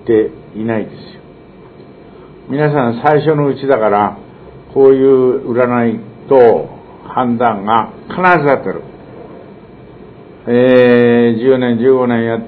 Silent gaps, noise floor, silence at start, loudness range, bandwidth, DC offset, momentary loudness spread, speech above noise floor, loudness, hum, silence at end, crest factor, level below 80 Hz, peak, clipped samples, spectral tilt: none; -37 dBFS; 0.05 s; 4 LU; 4.5 kHz; under 0.1%; 15 LU; 26 dB; -12 LUFS; none; 0 s; 12 dB; -50 dBFS; 0 dBFS; 0.2%; -10 dB/octave